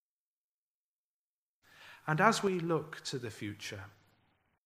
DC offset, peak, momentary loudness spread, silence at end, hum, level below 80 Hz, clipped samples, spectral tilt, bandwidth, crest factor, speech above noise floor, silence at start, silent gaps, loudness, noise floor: under 0.1%; -10 dBFS; 16 LU; 0.75 s; none; -78 dBFS; under 0.1%; -5 dB/octave; 15.5 kHz; 28 dB; over 57 dB; 1.8 s; none; -34 LUFS; under -90 dBFS